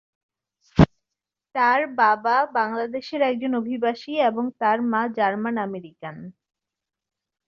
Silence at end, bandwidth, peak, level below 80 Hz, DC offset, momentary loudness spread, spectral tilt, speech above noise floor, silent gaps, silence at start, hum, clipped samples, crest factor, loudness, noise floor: 1.15 s; 7.2 kHz; -2 dBFS; -44 dBFS; under 0.1%; 12 LU; -8 dB/octave; 62 dB; none; 0.75 s; none; under 0.1%; 22 dB; -22 LUFS; -85 dBFS